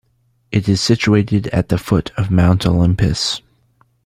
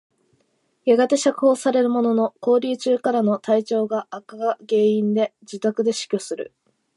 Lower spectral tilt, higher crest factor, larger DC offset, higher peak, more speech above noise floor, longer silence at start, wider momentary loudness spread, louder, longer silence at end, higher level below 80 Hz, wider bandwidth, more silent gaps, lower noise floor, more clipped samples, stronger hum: about the same, -6 dB/octave vs -5 dB/octave; about the same, 16 dB vs 14 dB; neither; first, 0 dBFS vs -6 dBFS; about the same, 46 dB vs 47 dB; second, 0.5 s vs 0.85 s; second, 6 LU vs 9 LU; first, -16 LUFS vs -21 LUFS; about the same, 0.65 s vs 0.55 s; first, -36 dBFS vs -78 dBFS; first, 14.5 kHz vs 11.5 kHz; neither; second, -60 dBFS vs -67 dBFS; neither; neither